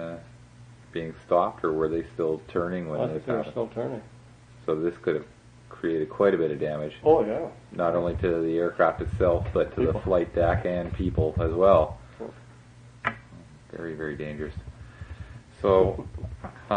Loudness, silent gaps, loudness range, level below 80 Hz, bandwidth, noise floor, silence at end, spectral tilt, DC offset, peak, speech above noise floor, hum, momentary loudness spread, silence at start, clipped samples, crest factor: -26 LUFS; none; 6 LU; -44 dBFS; 9.6 kHz; -50 dBFS; 0 s; -8.5 dB/octave; under 0.1%; -8 dBFS; 24 dB; none; 19 LU; 0 s; under 0.1%; 20 dB